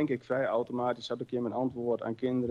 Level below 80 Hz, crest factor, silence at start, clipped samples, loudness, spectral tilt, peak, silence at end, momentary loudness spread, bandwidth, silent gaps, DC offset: -68 dBFS; 14 dB; 0 s; under 0.1%; -32 LUFS; -7.5 dB/octave; -18 dBFS; 0 s; 4 LU; 7.8 kHz; none; under 0.1%